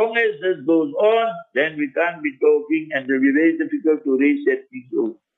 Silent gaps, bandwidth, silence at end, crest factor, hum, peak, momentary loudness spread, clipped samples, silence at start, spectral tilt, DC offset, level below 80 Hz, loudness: none; 4 kHz; 0.25 s; 14 dB; none; -6 dBFS; 6 LU; under 0.1%; 0 s; -7.5 dB/octave; under 0.1%; -76 dBFS; -20 LUFS